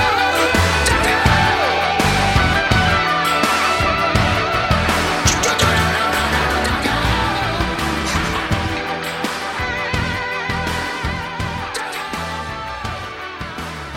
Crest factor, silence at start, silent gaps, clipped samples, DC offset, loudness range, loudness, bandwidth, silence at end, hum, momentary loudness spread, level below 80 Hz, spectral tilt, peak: 18 dB; 0 s; none; under 0.1%; under 0.1%; 8 LU; -17 LUFS; 17 kHz; 0 s; none; 10 LU; -30 dBFS; -4 dB/octave; 0 dBFS